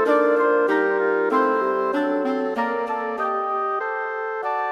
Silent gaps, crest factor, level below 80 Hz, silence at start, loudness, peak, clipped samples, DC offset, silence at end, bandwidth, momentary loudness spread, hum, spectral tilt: none; 14 dB; -70 dBFS; 0 s; -22 LUFS; -8 dBFS; under 0.1%; under 0.1%; 0 s; 9 kHz; 7 LU; none; -5.5 dB/octave